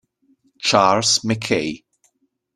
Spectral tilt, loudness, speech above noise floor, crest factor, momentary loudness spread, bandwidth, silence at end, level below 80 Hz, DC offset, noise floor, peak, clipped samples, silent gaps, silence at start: -3 dB/octave; -18 LUFS; 48 dB; 22 dB; 12 LU; 14.5 kHz; 0.8 s; -56 dBFS; under 0.1%; -66 dBFS; 0 dBFS; under 0.1%; none; 0.6 s